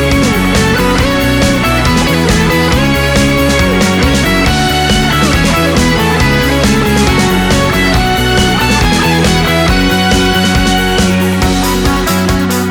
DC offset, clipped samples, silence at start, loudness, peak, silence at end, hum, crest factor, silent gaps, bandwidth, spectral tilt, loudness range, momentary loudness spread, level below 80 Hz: under 0.1%; under 0.1%; 0 s; -10 LUFS; 0 dBFS; 0 s; none; 10 dB; none; over 20 kHz; -4.5 dB/octave; 0 LU; 2 LU; -18 dBFS